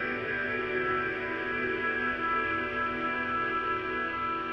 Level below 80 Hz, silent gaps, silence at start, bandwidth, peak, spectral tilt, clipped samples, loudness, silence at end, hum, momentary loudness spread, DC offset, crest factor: -56 dBFS; none; 0 s; 7 kHz; -18 dBFS; -6.5 dB/octave; under 0.1%; -30 LUFS; 0 s; none; 3 LU; under 0.1%; 12 dB